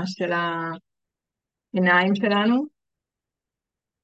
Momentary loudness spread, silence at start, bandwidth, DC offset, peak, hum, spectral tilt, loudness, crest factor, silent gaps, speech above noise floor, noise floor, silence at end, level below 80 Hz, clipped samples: 15 LU; 0 s; 7.8 kHz; under 0.1%; -4 dBFS; none; -6.5 dB/octave; -22 LUFS; 20 dB; none; 66 dB; -88 dBFS; 1.35 s; -76 dBFS; under 0.1%